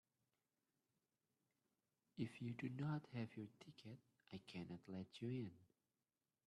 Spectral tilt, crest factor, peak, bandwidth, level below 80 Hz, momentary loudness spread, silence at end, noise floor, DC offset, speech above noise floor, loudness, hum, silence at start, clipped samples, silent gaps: -7.5 dB/octave; 22 dB; -32 dBFS; 12 kHz; -86 dBFS; 14 LU; 0.85 s; under -90 dBFS; under 0.1%; over 39 dB; -52 LUFS; none; 2.15 s; under 0.1%; none